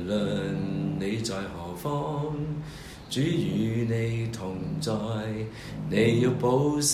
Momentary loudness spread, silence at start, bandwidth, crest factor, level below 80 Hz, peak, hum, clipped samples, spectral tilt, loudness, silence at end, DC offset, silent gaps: 11 LU; 0 s; 15 kHz; 18 dB; -52 dBFS; -10 dBFS; none; under 0.1%; -5.5 dB/octave; -28 LUFS; 0 s; under 0.1%; none